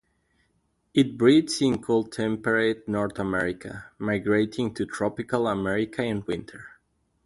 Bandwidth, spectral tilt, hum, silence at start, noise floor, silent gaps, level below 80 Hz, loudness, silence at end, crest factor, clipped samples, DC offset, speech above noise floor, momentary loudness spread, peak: 11.5 kHz; -5.5 dB/octave; none; 0.95 s; -71 dBFS; none; -56 dBFS; -25 LUFS; 0.6 s; 20 dB; under 0.1%; under 0.1%; 46 dB; 12 LU; -6 dBFS